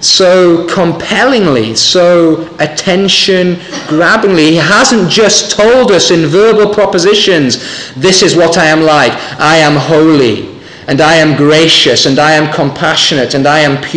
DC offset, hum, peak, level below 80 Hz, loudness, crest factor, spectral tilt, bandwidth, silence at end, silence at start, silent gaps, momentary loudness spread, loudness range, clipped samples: 0.3%; none; 0 dBFS; -42 dBFS; -7 LUFS; 8 dB; -3.5 dB/octave; 10.5 kHz; 0 s; 0 s; none; 7 LU; 2 LU; under 0.1%